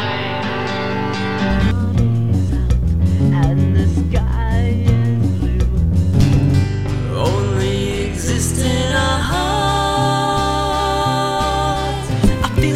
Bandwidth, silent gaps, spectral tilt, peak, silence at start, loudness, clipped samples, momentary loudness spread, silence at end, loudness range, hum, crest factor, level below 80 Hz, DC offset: 14.5 kHz; none; -6 dB/octave; -2 dBFS; 0 s; -17 LUFS; under 0.1%; 5 LU; 0 s; 1 LU; none; 14 dB; -24 dBFS; under 0.1%